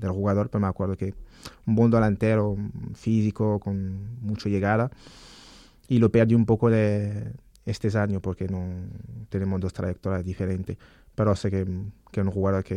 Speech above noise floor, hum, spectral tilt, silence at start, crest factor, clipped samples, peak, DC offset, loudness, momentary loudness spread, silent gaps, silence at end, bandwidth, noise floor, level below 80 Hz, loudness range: 26 dB; none; -8.5 dB/octave; 0 s; 18 dB; under 0.1%; -8 dBFS; under 0.1%; -26 LUFS; 15 LU; none; 0 s; 9.8 kHz; -51 dBFS; -50 dBFS; 5 LU